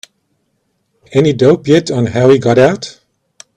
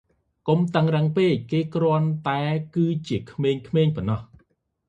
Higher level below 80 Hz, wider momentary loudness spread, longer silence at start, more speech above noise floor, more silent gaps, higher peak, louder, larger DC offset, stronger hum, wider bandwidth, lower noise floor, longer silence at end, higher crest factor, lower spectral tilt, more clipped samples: first, -48 dBFS vs -54 dBFS; about the same, 8 LU vs 7 LU; first, 1.1 s vs 0.45 s; first, 54 dB vs 44 dB; neither; first, 0 dBFS vs -4 dBFS; first, -11 LUFS vs -23 LUFS; neither; neither; first, 10 kHz vs 7.8 kHz; about the same, -64 dBFS vs -66 dBFS; about the same, 0.65 s vs 0.65 s; second, 12 dB vs 18 dB; second, -6.5 dB/octave vs -8.5 dB/octave; neither